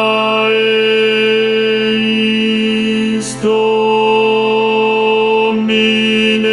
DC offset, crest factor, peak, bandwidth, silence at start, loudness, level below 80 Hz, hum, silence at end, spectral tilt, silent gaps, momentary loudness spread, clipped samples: under 0.1%; 10 dB; -2 dBFS; 11.5 kHz; 0 s; -12 LUFS; -56 dBFS; none; 0 s; -4.5 dB/octave; none; 3 LU; under 0.1%